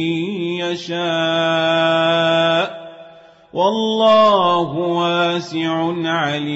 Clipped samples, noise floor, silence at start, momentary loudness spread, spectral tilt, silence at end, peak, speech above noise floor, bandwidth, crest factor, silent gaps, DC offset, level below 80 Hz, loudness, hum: under 0.1%; -44 dBFS; 0 s; 9 LU; -5.5 dB/octave; 0 s; -4 dBFS; 27 dB; 8 kHz; 14 dB; none; under 0.1%; -62 dBFS; -17 LUFS; none